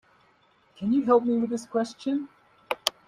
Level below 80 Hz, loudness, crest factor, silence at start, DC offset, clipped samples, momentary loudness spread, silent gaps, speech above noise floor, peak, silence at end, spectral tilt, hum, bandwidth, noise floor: -70 dBFS; -26 LUFS; 26 dB; 0.8 s; under 0.1%; under 0.1%; 12 LU; none; 38 dB; -2 dBFS; 0.2 s; -4.5 dB/octave; none; 15 kHz; -63 dBFS